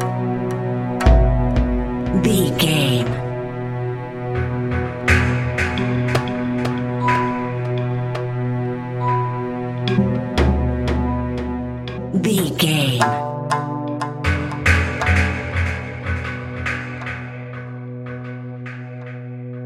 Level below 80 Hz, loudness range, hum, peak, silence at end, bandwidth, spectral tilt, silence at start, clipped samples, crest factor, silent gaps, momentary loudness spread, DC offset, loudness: -28 dBFS; 5 LU; none; -2 dBFS; 0 s; 15.5 kHz; -6 dB/octave; 0 s; under 0.1%; 18 dB; none; 14 LU; under 0.1%; -20 LUFS